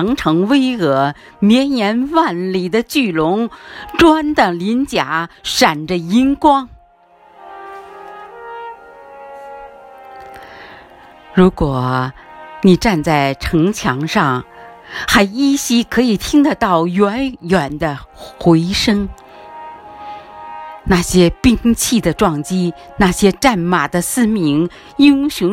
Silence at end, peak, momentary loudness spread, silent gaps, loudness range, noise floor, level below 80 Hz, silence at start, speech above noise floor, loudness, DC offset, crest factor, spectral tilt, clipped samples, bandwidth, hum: 0 s; 0 dBFS; 21 LU; none; 7 LU; -48 dBFS; -36 dBFS; 0 s; 34 dB; -14 LUFS; under 0.1%; 16 dB; -5 dB/octave; under 0.1%; 16.5 kHz; none